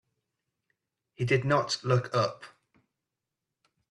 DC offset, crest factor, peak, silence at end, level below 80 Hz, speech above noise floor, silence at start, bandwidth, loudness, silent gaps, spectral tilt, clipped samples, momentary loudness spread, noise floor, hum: under 0.1%; 22 dB; -10 dBFS; 1.45 s; -66 dBFS; 60 dB; 1.2 s; 11.5 kHz; -28 LUFS; none; -5.5 dB/octave; under 0.1%; 9 LU; -87 dBFS; none